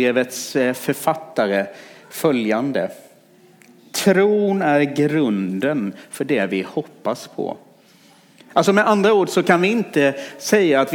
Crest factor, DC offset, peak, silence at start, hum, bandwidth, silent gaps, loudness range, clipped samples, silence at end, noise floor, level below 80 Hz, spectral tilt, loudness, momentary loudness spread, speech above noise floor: 18 dB; under 0.1%; -2 dBFS; 0 s; none; 19.5 kHz; none; 4 LU; under 0.1%; 0 s; -51 dBFS; -72 dBFS; -5 dB/octave; -19 LUFS; 12 LU; 32 dB